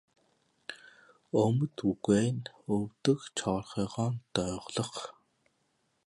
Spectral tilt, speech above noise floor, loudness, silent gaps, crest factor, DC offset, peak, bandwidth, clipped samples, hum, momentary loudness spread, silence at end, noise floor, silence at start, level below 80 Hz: -6 dB/octave; 45 dB; -32 LUFS; none; 20 dB; under 0.1%; -14 dBFS; 11.5 kHz; under 0.1%; none; 18 LU; 0.95 s; -76 dBFS; 0.7 s; -60 dBFS